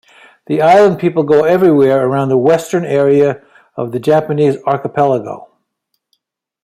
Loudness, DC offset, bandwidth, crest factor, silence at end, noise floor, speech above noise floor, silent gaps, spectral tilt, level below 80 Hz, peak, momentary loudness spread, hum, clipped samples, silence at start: -12 LUFS; under 0.1%; 14.5 kHz; 12 dB; 1.2 s; -70 dBFS; 59 dB; none; -7 dB/octave; -56 dBFS; 0 dBFS; 12 LU; none; under 0.1%; 0.5 s